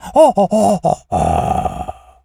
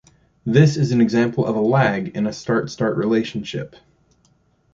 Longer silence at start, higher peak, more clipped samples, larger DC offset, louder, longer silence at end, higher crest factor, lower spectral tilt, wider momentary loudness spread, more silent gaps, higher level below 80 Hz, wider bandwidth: second, 0.05 s vs 0.45 s; about the same, 0 dBFS vs -2 dBFS; neither; neither; first, -15 LUFS vs -19 LUFS; second, 0.3 s vs 1.1 s; about the same, 14 dB vs 18 dB; about the same, -6.5 dB/octave vs -7 dB/octave; about the same, 13 LU vs 13 LU; neither; first, -34 dBFS vs -54 dBFS; first, 15.5 kHz vs 7.6 kHz